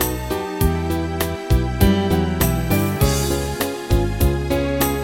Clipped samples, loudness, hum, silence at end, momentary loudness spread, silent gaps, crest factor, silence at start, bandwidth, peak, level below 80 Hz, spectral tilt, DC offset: under 0.1%; -20 LUFS; none; 0 s; 6 LU; none; 16 dB; 0 s; 16.5 kHz; -2 dBFS; -24 dBFS; -5.5 dB/octave; under 0.1%